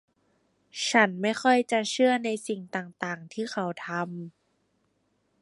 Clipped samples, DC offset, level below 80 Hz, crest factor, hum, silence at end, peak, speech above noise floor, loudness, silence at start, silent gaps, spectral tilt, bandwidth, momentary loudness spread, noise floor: under 0.1%; under 0.1%; -80 dBFS; 24 dB; none; 1.15 s; -6 dBFS; 45 dB; -27 LUFS; 0.75 s; none; -4 dB/octave; 11.5 kHz; 13 LU; -72 dBFS